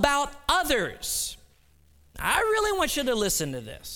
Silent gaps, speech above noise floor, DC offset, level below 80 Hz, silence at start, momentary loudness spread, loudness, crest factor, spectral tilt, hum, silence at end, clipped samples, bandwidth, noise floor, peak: none; 34 dB; under 0.1%; -44 dBFS; 0 s; 8 LU; -26 LUFS; 22 dB; -2 dB/octave; none; 0 s; under 0.1%; 19 kHz; -60 dBFS; -6 dBFS